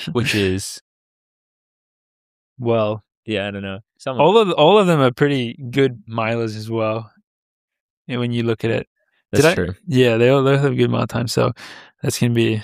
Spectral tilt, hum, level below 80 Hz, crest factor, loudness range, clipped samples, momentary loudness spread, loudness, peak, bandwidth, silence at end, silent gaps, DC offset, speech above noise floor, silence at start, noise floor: -6 dB/octave; none; -54 dBFS; 18 dB; 8 LU; under 0.1%; 14 LU; -18 LUFS; -2 dBFS; 15.5 kHz; 0 s; 0.81-2.56 s, 3.17-3.23 s, 7.24-7.68 s, 7.81-8.05 s, 8.87-8.96 s; under 0.1%; over 72 dB; 0 s; under -90 dBFS